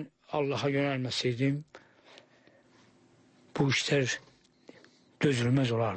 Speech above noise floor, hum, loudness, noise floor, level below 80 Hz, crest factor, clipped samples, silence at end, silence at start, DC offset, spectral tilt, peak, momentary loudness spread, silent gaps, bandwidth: 34 dB; none; -30 LUFS; -62 dBFS; -68 dBFS; 18 dB; under 0.1%; 0 s; 0 s; under 0.1%; -5.5 dB/octave; -14 dBFS; 9 LU; none; 8.8 kHz